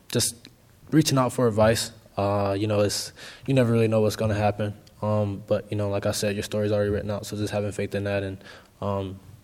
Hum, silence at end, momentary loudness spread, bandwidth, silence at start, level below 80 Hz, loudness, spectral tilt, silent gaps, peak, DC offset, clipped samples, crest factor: none; 0.1 s; 10 LU; 17 kHz; 0.1 s; -54 dBFS; -25 LUFS; -5.5 dB/octave; none; -6 dBFS; under 0.1%; under 0.1%; 18 dB